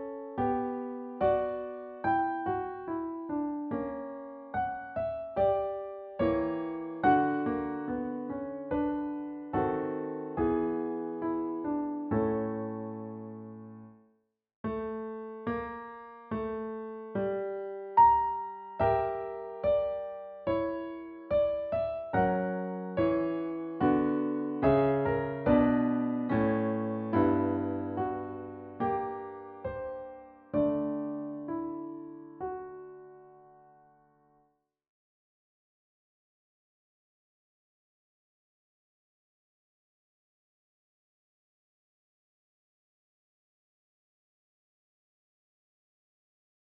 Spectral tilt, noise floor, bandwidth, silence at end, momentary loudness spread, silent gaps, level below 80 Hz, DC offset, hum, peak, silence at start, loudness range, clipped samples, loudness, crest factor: -7 dB/octave; -73 dBFS; 4.8 kHz; 13.25 s; 14 LU; 14.56-14.64 s; -58 dBFS; under 0.1%; none; -12 dBFS; 0 s; 10 LU; under 0.1%; -32 LUFS; 20 dB